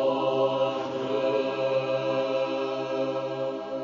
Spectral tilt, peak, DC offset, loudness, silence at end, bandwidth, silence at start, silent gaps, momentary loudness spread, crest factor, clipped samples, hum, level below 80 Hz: -6 dB/octave; -14 dBFS; under 0.1%; -27 LUFS; 0 s; 7.2 kHz; 0 s; none; 5 LU; 14 dB; under 0.1%; none; -74 dBFS